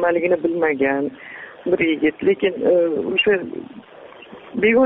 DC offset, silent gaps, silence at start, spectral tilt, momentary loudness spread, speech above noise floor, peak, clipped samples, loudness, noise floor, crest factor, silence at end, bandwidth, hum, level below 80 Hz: under 0.1%; none; 0 s; -3 dB/octave; 18 LU; 22 dB; -4 dBFS; under 0.1%; -19 LUFS; -40 dBFS; 14 dB; 0 s; 4.4 kHz; none; -58 dBFS